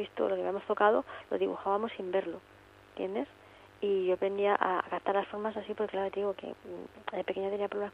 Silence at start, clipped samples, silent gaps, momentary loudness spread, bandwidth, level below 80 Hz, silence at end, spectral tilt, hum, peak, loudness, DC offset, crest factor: 0 s; under 0.1%; none; 14 LU; 5.6 kHz; -72 dBFS; 0.05 s; -7 dB/octave; none; -10 dBFS; -33 LUFS; under 0.1%; 24 dB